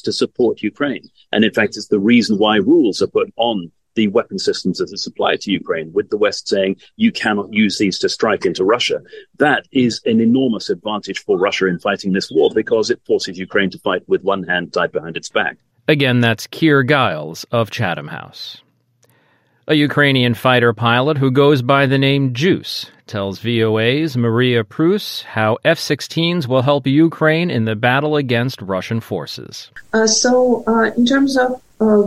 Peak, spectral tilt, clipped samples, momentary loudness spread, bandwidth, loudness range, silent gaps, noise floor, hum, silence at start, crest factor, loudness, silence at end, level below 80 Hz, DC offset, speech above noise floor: 0 dBFS; -5 dB/octave; under 0.1%; 10 LU; 15 kHz; 4 LU; none; -58 dBFS; none; 0.05 s; 16 dB; -16 LUFS; 0 s; -56 dBFS; under 0.1%; 42 dB